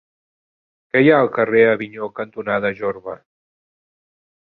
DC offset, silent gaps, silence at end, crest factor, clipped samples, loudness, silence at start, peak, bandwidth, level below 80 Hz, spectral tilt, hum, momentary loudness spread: under 0.1%; none; 1.25 s; 18 dB; under 0.1%; -18 LUFS; 0.95 s; -2 dBFS; 4.3 kHz; -62 dBFS; -9.5 dB/octave; none; 16 LU